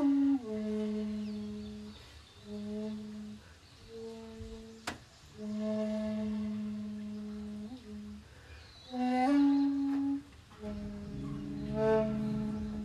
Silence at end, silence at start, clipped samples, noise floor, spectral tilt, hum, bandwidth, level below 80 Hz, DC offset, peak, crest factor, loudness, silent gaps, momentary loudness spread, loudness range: 0 s; 0 s; under 0.1%; -55 dBFS; -7 dB/octave; none; 11.5 kHz; -56 dBFS; under 0.1%; -18 dBFS; 16 dB; -35 LUFS; none; 22 LU; 12 LU